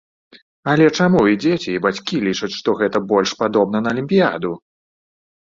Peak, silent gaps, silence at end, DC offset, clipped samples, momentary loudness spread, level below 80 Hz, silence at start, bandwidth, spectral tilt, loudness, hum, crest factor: -2 dBFS; 0.42-0.63 s; 0.9 s; under 0.1%; under 0.1%; 7 LU; -54 dBFS; 0.35 s; 7.6 kHz; -6 dB/octave; -17 LUFS; none; 16 dB